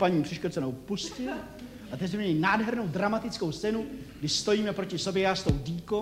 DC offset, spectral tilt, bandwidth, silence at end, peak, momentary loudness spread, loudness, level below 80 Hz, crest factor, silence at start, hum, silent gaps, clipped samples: under 0.1%; -5 dB/octave; 16.5 kHz; 0 s; -12 dBFS; 10 LU; -30 LUFS; -48 dBFS; 18 dB; 0 s; none; none; under 0.1%